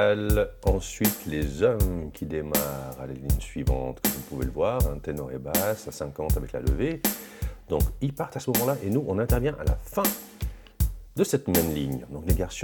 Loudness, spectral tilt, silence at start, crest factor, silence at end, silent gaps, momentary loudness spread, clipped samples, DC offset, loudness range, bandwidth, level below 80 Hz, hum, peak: -28 LUFS; -5.5 dB/octave; 0 s; 20 dB; 0 s; none; 9 LU; under 0.1%; under 0.1%; 2 LU; 19 kHz; -32 dBFS; none; -8 dBFS